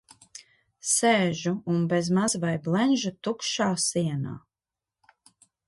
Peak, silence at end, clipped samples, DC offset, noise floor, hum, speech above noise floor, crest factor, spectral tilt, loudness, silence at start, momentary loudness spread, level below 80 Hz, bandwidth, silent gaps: -10 dBFS; 1.3 s; under 0.1%; under 0.1%; under -90 dBFS; none; over 65 dB; 16 dB; -4 dB/octave; -25 LUFS; 0.35 s; 20 LU; -66 dBFS; 12 kHz; none